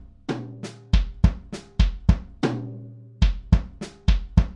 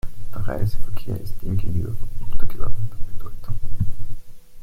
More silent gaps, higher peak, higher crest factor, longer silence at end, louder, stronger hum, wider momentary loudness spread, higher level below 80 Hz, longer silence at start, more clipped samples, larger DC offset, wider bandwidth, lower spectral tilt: neither; about the same, -2 dBFS vs -2 dBFS; first, 20 dB vs 12 dB; about the same, 0 s vs 0 s; first, -25 LUFS vs -30 LUFS; neither; first, 16 LU vs 12 LU; about the same, -24 dBFS vs -28 dBFS; first, 0.3 s vs 0.05 s; neither; neither; first, 9 kHz vs 5 kHz; about the same, -7 dB/octave vs -8 dB/octave